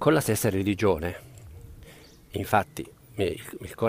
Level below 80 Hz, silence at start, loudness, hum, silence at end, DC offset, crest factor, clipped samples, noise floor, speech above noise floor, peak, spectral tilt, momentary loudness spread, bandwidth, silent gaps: -50 dBFS; 0 s; -27 LUFS; none; 0 s; under 0.1%; 22 dB; under 0.1%; -50 dBFS; 24 dB; -6 dBFS; -5.5 dB/octave; 23 LU; 15.5 kHz; none